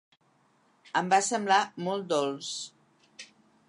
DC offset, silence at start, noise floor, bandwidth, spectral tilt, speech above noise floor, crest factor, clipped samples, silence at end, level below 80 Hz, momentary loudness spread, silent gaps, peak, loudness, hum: under 0.1%; 0.95 s; -67 dBFS; 11 kHz; -3 dB/octave; 39 dB; 22 dB; under 0.1%; 0.45 s; -84 dBFS; 23 LU; none; -10 dBFS; -28 LUFS; none